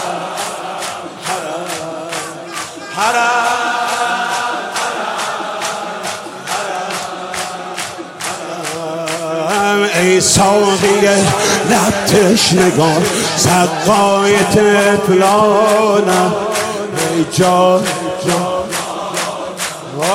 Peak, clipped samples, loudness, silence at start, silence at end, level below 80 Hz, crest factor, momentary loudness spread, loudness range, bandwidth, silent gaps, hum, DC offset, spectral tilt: 0 dBFS; under 0.1%; -14 LUFS; 0 s; 0 s; -48 dBFS; 14 dB; 12 LU; 10 LU; 16.5 kHz; none; none; under 0.1%; -3.5 dB/octave